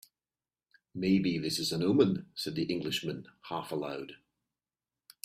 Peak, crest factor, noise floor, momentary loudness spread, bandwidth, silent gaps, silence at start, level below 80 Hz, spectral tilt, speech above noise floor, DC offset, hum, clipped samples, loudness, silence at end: -12 dBFS; 22 dB; under -90 dBFS; 14 LU; 15.5 kHz; none; 0.95 s; -68 dBFS; -5.5 dB/octave; over 58 dB; under 0.1%; none; under 0.1%; -32 LUFS; 1.1 s